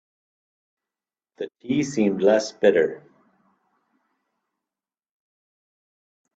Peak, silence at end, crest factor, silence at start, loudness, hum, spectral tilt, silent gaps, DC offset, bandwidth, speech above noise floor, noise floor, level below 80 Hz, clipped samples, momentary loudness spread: -4 dBFS; 3.4 s; 22 dB; 1.4 s; -21 LUFS; none; -5.5 dB/octave; none; under 0.1%; 8.2 kHz; over 69 dB; under -90 dBFS; -68 dBFS; under 0.1%; 17 LU